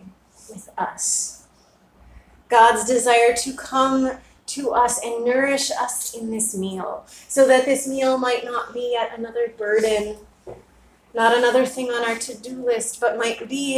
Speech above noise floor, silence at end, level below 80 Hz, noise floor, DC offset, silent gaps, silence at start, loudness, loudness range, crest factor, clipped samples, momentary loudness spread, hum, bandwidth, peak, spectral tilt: 35 dB; 0 s; -56 dBFS; -56 dBFS; under 0.1%; none; 0.05 s; -20 LUFS; 4 LU; 20 dB; under 0.1%; 14 LU; none; 16 kHz; -2 dBFS; -2 dB/octave